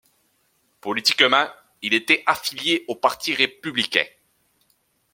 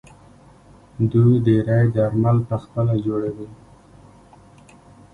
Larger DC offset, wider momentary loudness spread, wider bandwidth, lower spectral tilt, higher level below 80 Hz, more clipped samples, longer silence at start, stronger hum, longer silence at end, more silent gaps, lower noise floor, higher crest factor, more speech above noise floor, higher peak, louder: neither; about the same, 12 LU vs 11 LU; first, 16.5 kHz vs 4.1 kHz; second, -2 dB/octave vs -10.5 dB/octave; second, -68 dBFS vs -48 dBFS; neither; second, 0.85 s vs 1 s; neither; second, 1.05 s vs 1.6 s; neither; first, -66 dBFS vs -48 dBFS; first, 24 dB vs 16 dB; first, 45 dB vs 30 dB; first, 0 dBFS vs -4 dBFS; about the same, -20 LUFS vs -19 LUFS